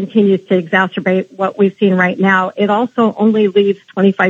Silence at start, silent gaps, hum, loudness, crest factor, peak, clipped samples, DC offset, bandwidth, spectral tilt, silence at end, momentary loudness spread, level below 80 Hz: 0 s; none; none; -14 LUFS; 12 dB; 0 dBFS; under 0.1%; under 0.1%; 7.2 kHz; -8 dB/octave; 0 s; 4 LU; -72 dBFS